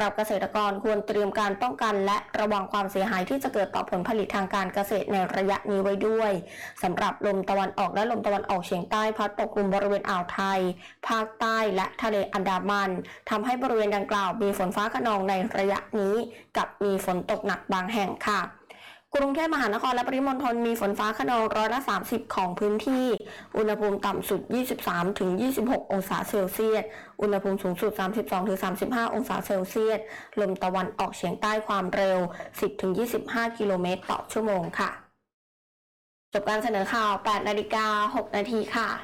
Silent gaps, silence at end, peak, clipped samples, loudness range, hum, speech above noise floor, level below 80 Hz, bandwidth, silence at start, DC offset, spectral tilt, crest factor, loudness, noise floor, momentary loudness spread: 35.34-36.32 s; 0 s; -20 dBFS; under 0.1%; 2 LU; none; 23 dB; -58 dBFS; 18.5 kHz; 0 s; under 0.1%; -5 dB/octave; 8 dB; -27 LUFS; -50 dBFS; 5 LU